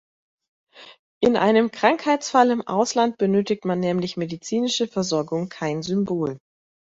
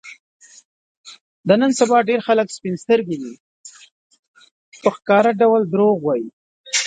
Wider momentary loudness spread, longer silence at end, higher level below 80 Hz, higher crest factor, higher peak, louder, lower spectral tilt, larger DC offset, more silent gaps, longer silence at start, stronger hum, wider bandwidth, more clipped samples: second, 9 LU vs 13 LU; first, 0.45 s vs 0 s; about the same, -64 dBFS vs -68 dBFS; about the same, 20 dB vs 18 dB; about the same, -2 dBFS vs 0 dBFS; second, -22 LUFS vs -18 LUFS; about the same, -5 dB/octave vs -4.5 dB/octave; neither; second, 0.99-1.21 s vs 0.19-0.40 s, 0.65-1.04 s, 1.21-1.44 s, 3.40-3.64 s, 3.91-4.10 s, 4.19-4.34 s, 4.51-4.72 s, 6.33-6.64 s; first, 0.75 s vs 0.05 s; neither; second, 8 kHz vs 9.4 kHz; neither